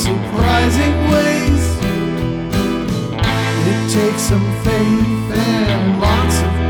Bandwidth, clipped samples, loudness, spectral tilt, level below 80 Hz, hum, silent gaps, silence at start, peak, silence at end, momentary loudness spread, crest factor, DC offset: over 20 kHz; under 0.1%; -15 LUFS; -5.5 dB/octave; -24 dBFS; none; none; 0 s; -6 dBFS; 0 s; 5 LU; 10 dB; under 0.1%